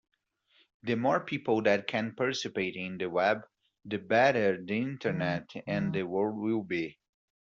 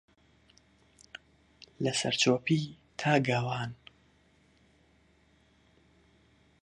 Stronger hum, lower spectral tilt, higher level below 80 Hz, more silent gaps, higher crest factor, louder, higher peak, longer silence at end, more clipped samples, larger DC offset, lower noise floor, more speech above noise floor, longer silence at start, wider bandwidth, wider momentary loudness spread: neither; about the same, -4.5 dB/octave vs -4.5 dB/octave; about the same, -70 dBFS vs -68 dBFS; neither; about the same, 20 dB vs 24 dB; about the same, -30 LUFS vs -30 LUFS; about the same, -10 dBFS vs -10 dBFS; second, 0.55 s vs 2.9 s; neither; neither; about the same, -69 dBFS vs -66 dBFS; about the same, 39 dB vs 37 dB; second, 0.85 s vs 1.8 s; second, 7.6 kHz vs 11.5 kHz; second, 10 LU vs 24 LU